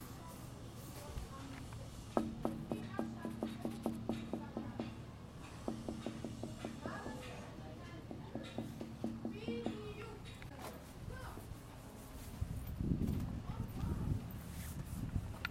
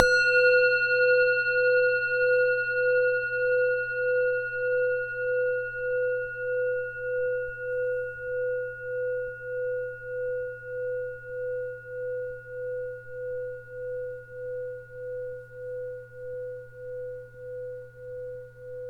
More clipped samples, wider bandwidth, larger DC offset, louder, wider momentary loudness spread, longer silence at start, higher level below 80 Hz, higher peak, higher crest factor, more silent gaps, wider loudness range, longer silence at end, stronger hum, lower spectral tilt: neither; first, 16.5 kHz vs 8.2 kHz; neither; second, -45 LUFS vs -27 LUFS; second, 10 LU vs 17 LU; about the same, 0 s vs 0 s; first, -52 dBFS vs -58 dBFS; second, -16 dBFS vs 0 dBFS; about the same, 28 dB vs 28 dB; neither; second, 4 LU vs 14 LU; about the same, 0 s vs 0 s; neither; first, -6.5 dB/octave vs -3 dB/octave